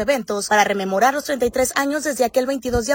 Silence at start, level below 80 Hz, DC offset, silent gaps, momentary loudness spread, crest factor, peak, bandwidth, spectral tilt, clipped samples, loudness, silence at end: 0 s; -42 dBFS; under 0.1%; none; 5 LU; 18 dB; -2 dBFS; 16.5 kHz; -3 dB/octave; under 0.1%; -19 LUFS; 0 s